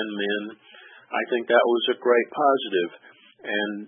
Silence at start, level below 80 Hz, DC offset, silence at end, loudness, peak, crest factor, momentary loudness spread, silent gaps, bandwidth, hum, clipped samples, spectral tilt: 0 s; -86 dBFS; under 0.1%; 0 s; -23 LUFS; -4 dBFS; 20 dB; 11 LU; none; 3.7 kHz; none; under 0.1%; -8.5 dB/octave